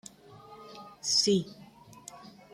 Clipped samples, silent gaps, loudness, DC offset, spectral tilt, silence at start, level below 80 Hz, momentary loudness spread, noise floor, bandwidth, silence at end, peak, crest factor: under 0.1%; none; -27 LUFS; under 0.1%; -3.5 dB/octave; 0.3 s; -72 dBFS; 26 LU; -52 dBFS; 15 kHz; 0.25 s; -10 dBFS; 24 dB